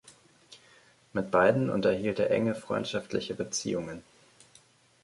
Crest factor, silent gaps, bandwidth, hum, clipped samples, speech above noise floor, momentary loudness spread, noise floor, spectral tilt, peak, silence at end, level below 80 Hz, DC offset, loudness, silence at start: 22 dB; none; 11.5 kHz; none; under 0.1%; 33 dB; 11 LU; -61 dBFS; -5 dB/octave; -10 dBFS; 1 s; -62 dBFS; under 0.1%; -29 LUFS; 0.05 s